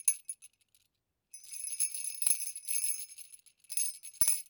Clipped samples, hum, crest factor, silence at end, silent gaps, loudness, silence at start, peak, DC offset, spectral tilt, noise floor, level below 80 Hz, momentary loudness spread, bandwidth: under 0.1%; none; 22 dB; 0.05 s; none; -32 LUFS; 0.05 s; -14 dBFS; under 0.1%; 2.5 dB/octave; -81 dBFS; -74 dBFS; 20 LU; over 20 kHz